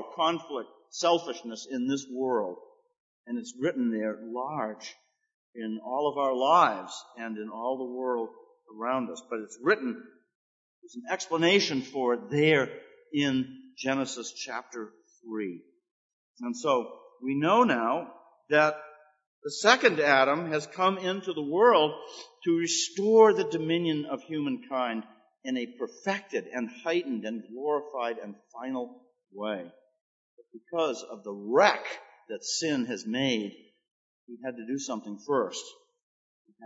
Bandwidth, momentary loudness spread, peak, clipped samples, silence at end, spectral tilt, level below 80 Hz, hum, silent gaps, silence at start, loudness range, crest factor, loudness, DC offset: 8 kHz; 18 LU; -4 dBFS; under 0.1%; 0 s; -4 dB/octave; -84 dBFS; none; 3.00-3.24 s, 5.34-5.53 s, 10.35-10.82 s, 15.91-16.34 s, 19.27-19.42 s, 30.01-30.37 s, 33.91-34.27 s, 36.03-36.45 s; 0 s; 10 LU; 26 dB; -28 LUFS; under 0.1%